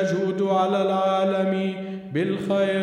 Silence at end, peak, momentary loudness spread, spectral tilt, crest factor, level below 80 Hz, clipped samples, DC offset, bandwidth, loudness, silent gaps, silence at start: 0 s; -8 dBFS; 7 LU; -7 dB/octave; 14 dB; -68 dBFS; under 0.1%; under 0.1%; 10.5 kHz; -23 LUFS; none; 0 s